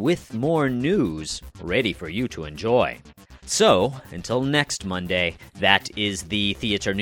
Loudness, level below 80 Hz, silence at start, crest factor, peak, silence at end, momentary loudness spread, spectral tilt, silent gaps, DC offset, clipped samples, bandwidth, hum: -23 LUFS; -46 dBFS; 0 s; 24 dB; 0 dBFS; 0 s; 10 LU; -4 dB/octave; none; under 0.1%; under 0.1%; 17.5 kHz; none